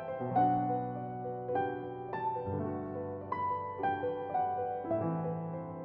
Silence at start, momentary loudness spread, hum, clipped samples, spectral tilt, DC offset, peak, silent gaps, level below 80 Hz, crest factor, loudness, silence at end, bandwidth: 0 s; 9 LU; none; under 0.1%; -7.5 dB/octave; under 0.1%; -18 dBFS; none; -68 dBFS; 16 dB; -35 LUFS; 0 s; 4.8 kHz